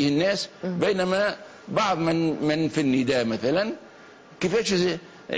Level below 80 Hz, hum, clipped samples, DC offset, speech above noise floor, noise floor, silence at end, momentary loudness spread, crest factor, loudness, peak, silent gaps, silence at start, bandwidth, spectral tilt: -58 dBFS; none; under 0.1%; under 0.1%; 24 dB; -48 dBFS; 0 s; 8 LU; 14 dB; -24 LUFS; -10 dBFS; none; 0 s; 8 kHz; -5 dB/octave